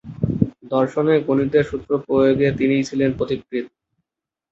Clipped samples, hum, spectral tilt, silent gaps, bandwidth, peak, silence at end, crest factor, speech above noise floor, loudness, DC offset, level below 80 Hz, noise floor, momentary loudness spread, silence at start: under 0.1%; none; -7.5 dB/octave; none; 7.8 kHz; -2 dBFS; 0.85 s; 18 dB; 68 dB; -20 LUFS; under 0.1%; -46 dBFS; -86 dBFS; 8 LU; 0.05 s